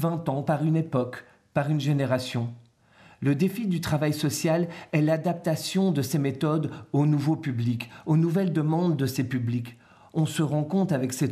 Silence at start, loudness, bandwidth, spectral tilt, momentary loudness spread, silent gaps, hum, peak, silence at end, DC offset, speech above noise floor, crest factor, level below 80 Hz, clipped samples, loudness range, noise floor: 0 s; -26 LUFS; 14.5 kHz; -6.5 dB/octave; 6 LU; none; none; -10 dBFS; 0 s; under 0.1%; 30 dB; 14 dB; -64 dBFS; under 0.1%; 2 LU; -56 dBFS